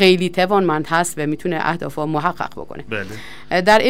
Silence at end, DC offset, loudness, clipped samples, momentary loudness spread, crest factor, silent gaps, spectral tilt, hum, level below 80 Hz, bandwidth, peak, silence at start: 0 s; 2%; -19 LUFS; under 0.1%; 12 LU; 16 dB; none; -4.5 dB/octave; none; -50 dBFS; 16 kHz; -2 dBFS; 0 s